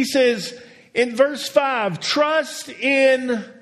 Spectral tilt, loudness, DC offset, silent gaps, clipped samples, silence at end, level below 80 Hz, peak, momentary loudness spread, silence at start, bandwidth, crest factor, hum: -3.5 dB/octave; -19 LUFS; under 0.1%; none; under 0.1%; 0.1 s; -70 dBFS; -2 dBFS; 10 LU; 0 s; 13.5 kHz; 18 dB; none